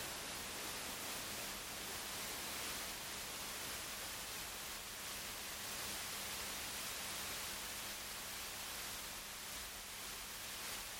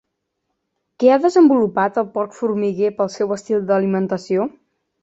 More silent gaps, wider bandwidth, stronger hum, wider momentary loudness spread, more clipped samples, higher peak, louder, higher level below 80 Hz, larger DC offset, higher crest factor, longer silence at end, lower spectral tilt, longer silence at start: neither; first, 17 kHz vs 8 kHz; neither; second, 3 LU vs 9 LU; neither; second, -32 dBFS vs -2 dBFS; second, -44 LUFS vs -18 LUFS; about the same, -64 dBFS vs -64 dBFS; neither; about the same, 14 dB vs 16 dB; second, 0 s vs 0.55 s; second, -0.5 dB/octave vs -7 dB/octave; second, 0 s vs 1 s